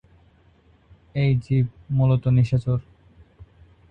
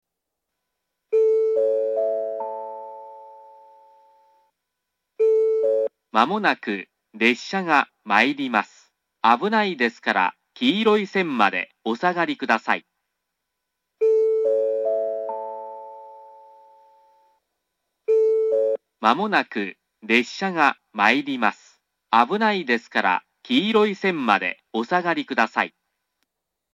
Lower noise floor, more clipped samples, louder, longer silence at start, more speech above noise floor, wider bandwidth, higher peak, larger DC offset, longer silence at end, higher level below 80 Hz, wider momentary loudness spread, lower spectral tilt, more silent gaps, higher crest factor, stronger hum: second, -57 dBFS vs -82 dBFS; neither; about the same, -22 LUFS vs -21 LUFS; about the same, 1.15 s vs 1.1 s; second, 36 dB vs 61 dB; second, 5.4 kHz vs 8.4 kHz; second, -8 dBFS vs 0 dBFS; neither; about the same, 1.1 s vs 1.05 s; first, -46 dBFS vs -80 dBFS; second, 8 LU vs 12 LU; first, -9.5 dB/octave vs -5 dB/octave; neither; second, 16 dB vs 22 dB; neither